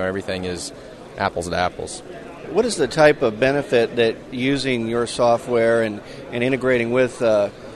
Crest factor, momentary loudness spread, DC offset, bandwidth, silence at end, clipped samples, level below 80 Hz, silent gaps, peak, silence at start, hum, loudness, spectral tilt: 18 dB; 15 LU; under 0.1%; 12.5 kHz; 0 s; under 0.1%; -48 dBFS; none; -2 dBFS; 0 s; none; -20 LUFS; -5 dB/octave